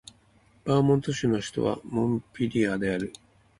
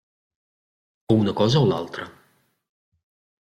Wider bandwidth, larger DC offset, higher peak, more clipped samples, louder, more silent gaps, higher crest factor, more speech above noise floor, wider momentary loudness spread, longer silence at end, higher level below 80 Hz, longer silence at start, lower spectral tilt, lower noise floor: about the same, 11.5 kHz vs 12 kHz; neither; second, -10 dBFS vs -6 dBFS; neither; second, -27 LUFS vs -21 LUFS; neither; about the same, 16 dB vs 20 dB; second, 35 dB vs 44 dB; second, 7 LU vs 16 LU; second, 0.5 s vs 1.45 s; about the same, -56 dBFS vs -58 dBFS; second, 0.65 s vs 1.1 s; about the same, -6.5 dB/octave vs -7 dB/octave; about the same, -61 dBFS vs -64 dBFS